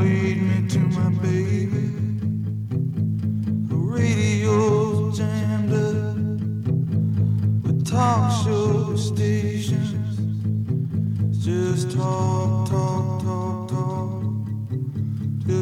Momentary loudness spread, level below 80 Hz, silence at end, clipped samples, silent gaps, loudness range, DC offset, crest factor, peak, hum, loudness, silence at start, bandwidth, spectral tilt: 6 LU; -54 dBFS; 0 s; under 0.1%; none; 2 LU; under 0.1%; 14 dB; -8 dBFS; none; -23 LUFS; 0 s; 11.5 kHz; -7.5 dB/octave